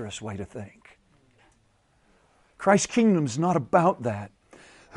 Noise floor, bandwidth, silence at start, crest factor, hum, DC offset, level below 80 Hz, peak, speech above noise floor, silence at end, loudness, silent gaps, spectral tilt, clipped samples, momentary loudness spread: -65 dBFS; 11.5 kHz; 0 s; 22 dB; none; under 0.1%; -62 dBFS; -6 dBFS; 41 dB; 0 s; -24 LUFS; none; -5.5 dB/octave; under 0.1%; 19 LU